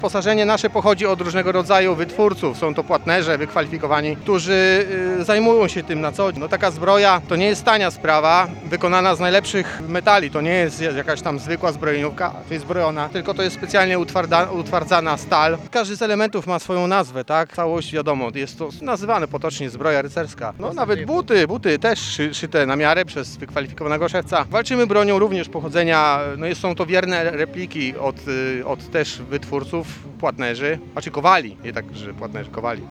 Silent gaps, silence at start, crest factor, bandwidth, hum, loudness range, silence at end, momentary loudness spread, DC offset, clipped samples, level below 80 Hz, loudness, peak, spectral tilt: none; 0 s; 18 dB; 13.5 kHz; none; 6 LU; 0 s; 10 LU; under 0.1%; under 0.1%; -50 dBFS; -19 LUFS; 0 dBFS; -5 dB/octave